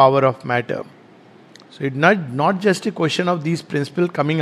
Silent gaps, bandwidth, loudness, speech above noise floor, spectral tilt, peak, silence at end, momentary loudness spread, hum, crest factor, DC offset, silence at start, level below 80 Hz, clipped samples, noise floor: none; 13.5 kHz; -19 LUFS; 28 dB; -6 dB/octave; 0 dBFS; 0 s; 11 LU; none; 18 dB; under 0.1%; 0 s; -66 dBFS; under 0.1%; -46 dBFS